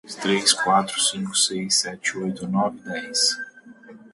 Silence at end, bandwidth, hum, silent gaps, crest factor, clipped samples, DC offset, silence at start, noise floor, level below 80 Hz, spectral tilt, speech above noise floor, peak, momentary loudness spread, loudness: 0.05 s; 12 kHz; none; none; 20 dB; under 0.1%; under 0.1%; 0.05 s; -45 dBFS; -66 dBFS; -2 dB/octave; 22 dB; -4 dBFS; 10 LU; -21 LUFS